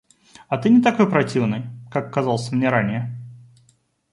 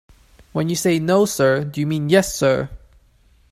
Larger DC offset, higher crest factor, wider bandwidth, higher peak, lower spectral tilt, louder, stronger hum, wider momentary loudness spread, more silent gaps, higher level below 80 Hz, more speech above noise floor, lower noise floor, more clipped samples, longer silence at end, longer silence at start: neither; about the same, 18 dB vs 18 dB; second, 11 kHz vs 15.5 kHz; about the same, -2 dBFS vs -2 dBFS; first, -7 dB/octave vs -5 dB/octave; about the same, -20 LUFS vs -19 LUFS; neither; first, 13 LU vs 8 LU; neither; second, -60 dBFS vs -48 dBFS; first, 42 dB vs 37 dB; first, -61 dBFS vs -55 dBFS; neither; about the same, 0.75 s vs 0.75 s; about the same, 0.5 s vs 0.55 s